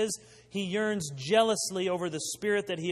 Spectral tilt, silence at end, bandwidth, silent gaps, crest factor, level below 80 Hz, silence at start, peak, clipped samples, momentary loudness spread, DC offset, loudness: -3.5 dB/octave; 0 s; 13.5 kHz; none; 18 dB; -68 dBFS; 0 s; -10 dBFS; under 0.1%; 10 LU; under 0.1%; -30 LUFS